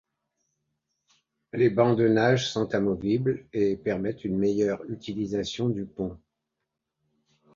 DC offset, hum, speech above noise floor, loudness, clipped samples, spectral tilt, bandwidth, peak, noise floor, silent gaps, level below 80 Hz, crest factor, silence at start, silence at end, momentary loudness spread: under 0.1%; none; 58 dB; -26 LUFS; under 0.1%; -6.5 dB/octave; 7.6 kHz; -8 dBFS; -83 dBFS; none; -58 dBFS; 20 dB; 1.55 s; 1.4 s; 12 LU